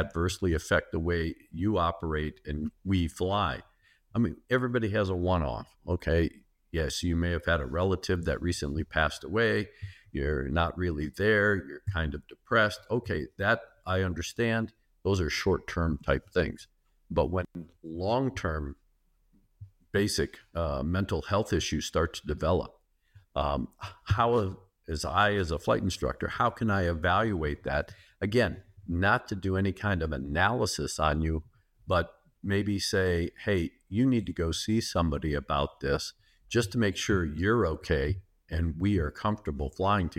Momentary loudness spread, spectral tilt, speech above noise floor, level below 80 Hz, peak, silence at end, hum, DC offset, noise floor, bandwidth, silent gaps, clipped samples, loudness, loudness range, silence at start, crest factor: 9 LU; -5.5 dB/octave; 39 dB; -42 dBFS; -10 dBFS; 0.05 s; none; under 0.1%; -68 dBFS; 15.5 kHz; none; under 0.1%; -30 LUFS; 3 LU; 0 s; 20 dB